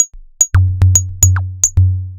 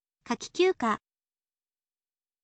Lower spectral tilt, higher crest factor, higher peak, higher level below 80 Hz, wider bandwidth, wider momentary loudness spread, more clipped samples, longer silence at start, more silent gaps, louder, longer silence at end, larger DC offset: about the same, -3 dB/octave vs -4 dB/octave; second, 12 dB vs 18 dB; first, 0 dBFS vs -14 dBFS; first, -26 dBFS vs -72 dBFS; first, over 20 kHz vs 8.8 kHz; second, 4 LU vs 10 LU; first, 0.3% vs under 0.1%; second, 0 s vs 0.25 s; neither; first, -12 LUFS vs -29 LUFS; second, 0 s vs 1.45 s; neither